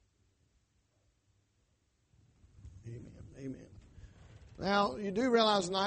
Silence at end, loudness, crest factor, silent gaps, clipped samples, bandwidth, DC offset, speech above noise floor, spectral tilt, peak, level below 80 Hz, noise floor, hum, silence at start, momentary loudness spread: 0 s; -31 LUFS; 22 dB; none; under 0.1%; 8.4 kHz; under 0.1%; 44 dB; -4.5 dB/octave; -14 dBFS; -62 dBFS; -75 dBFS; none; 2.65 s; 23 LU